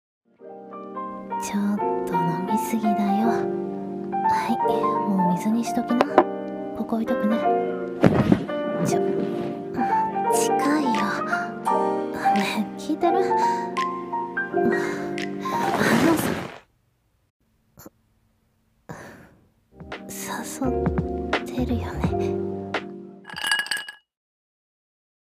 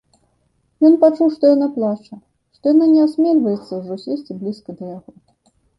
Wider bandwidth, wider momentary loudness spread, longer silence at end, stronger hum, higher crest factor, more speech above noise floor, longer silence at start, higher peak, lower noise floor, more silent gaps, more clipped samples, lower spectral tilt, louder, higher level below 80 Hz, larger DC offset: first, 16 kHz vs 5.6 kHz; second, 12 LU vs 18 LU; first, 1.3 s vs 0.8 s; neither; first, 24 dB vs 16 dB; about the same, 45 dB vs 48 dB; second, 0.4 s vs 0.8 s; about the same, -2 dBFS vs -2 dBFS; about the same, -67 dBFS vs -64 dBFS; first, 17.30-17.40 s vs none; neither; second, -5.5 dB/octave vs -9 dB/octave; second, -24 LUFS vs -16 LUFS; first, -46 dBFS vs -66 dBFS; neither